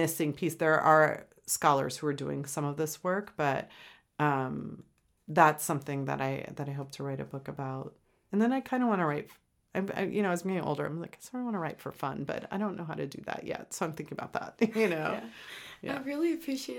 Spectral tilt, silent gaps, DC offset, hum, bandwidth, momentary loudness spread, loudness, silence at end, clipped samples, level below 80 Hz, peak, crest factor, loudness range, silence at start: -5 dB/octave; none; under 0.1%; none; 19 kHz; 14 LU; -31 LUFS; 0 s; under 0.1%; -70 dBFS; -6 dBFS; 26 dB; 7 LU; 0 s